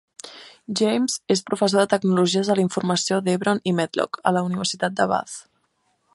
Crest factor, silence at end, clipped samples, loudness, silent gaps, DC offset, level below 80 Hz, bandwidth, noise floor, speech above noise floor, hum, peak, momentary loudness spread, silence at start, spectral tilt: 20 dB; 0.75 s; under 0.1%; -22 LUFS; none; under 0.1%; -68 dBFS; 11.5 kHz; -69 dBFS; 47 dB; none; -2 dBFS; 15 LU; 0.25 s; -4.5 dB/octave